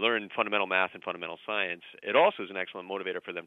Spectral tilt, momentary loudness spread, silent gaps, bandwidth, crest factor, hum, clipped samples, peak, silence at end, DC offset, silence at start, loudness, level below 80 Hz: -6 dB/octave; 12 LU; none; 5.4 kHz; 20 dB; none; under 0.1%; -10 dBFS; 0 s; under 0.1%; 0 s; -30 LUFS; -86 dBFS